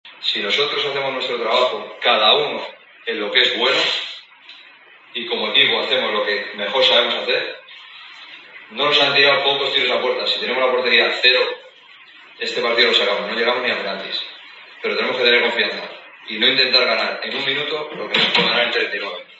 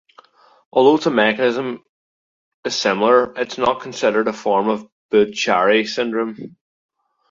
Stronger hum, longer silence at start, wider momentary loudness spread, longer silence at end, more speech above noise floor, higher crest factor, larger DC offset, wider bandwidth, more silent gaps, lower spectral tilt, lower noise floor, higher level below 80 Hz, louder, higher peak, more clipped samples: neither; second, 0.05 s vs 0.75 s; first, 17 LU vs 12 LU; second, 0.15 s vs 0.8 s; second, 28 dB vs 33 dB; about the same, 20 dB vs 18 dB; neither; about the same, 8 kHz vs 7.8 kHz; second, none vs 1.89-2.63 s, 4.92-5.09 s; second, -2.5 dB/octave vs -4 dB/octave; second, -46 dBFS vs -50 dBFS; second, -80 dBFS vs -62 dBFS; about the same, -17 LUFS vs -18 LUFS; about the same, 0 dBFS vs 0 dBFS; neither